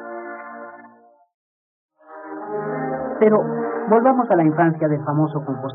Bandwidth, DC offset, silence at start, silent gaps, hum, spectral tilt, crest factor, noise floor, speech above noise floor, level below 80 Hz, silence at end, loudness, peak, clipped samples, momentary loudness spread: 3.8 kHz; under 0.1%; 0 s; 1.34-1.89 s; none; -8.5 dB/octave; 18 dB; -50 dBFS; 32 dB; -70 dBFS; 0 s; -19 LUFS; -4 dBFS; under 0.1%; 19 LU